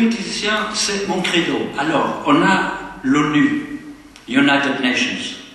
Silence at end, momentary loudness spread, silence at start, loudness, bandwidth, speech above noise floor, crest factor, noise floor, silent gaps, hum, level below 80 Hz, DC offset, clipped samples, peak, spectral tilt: 0 s; 10 LU; 0 s; -17 LUFS; 12.5 kHz; 21 dB; 16 dB; -38 dBFS; none; none; -52 dBFS; under 0.1%; under 0.1%; -2 dBFS; -4 dB/octave